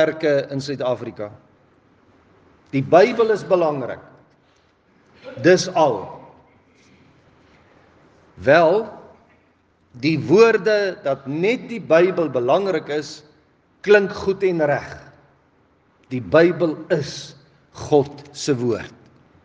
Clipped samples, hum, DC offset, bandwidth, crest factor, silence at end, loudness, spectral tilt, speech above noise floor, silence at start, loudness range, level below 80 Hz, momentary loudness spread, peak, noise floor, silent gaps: under 0.1%; none; under 0.1%; 9.4 kHz; 20 dB; 0.55 s; -19 LUFS; -5.5 dB/octave; 41 dB; 0 s; 4 LU; -62 dBFS; 20 LU; 0 dBFS; -60 dBFS; none